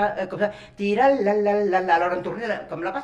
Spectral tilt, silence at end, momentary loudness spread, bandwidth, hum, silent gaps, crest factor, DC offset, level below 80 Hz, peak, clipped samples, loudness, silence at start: -6.5 dB/octave; 0 s; 9 LU; 9.4 kHz; none; none; 16 dB; under 0.1%; -58 dBFS; -6 dBFS; under 0.1%; -22 LUFS; 0 s